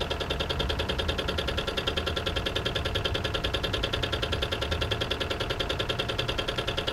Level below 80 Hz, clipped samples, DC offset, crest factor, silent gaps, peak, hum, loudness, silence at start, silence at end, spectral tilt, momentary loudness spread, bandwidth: -38 dBFS; under 0.1%; under 0.1%; 18 dB; none; -12 dBFS; none; -29 LUFS; 0 s; 0 s; -4.5 dB/octave; 1 LU; 17 kHz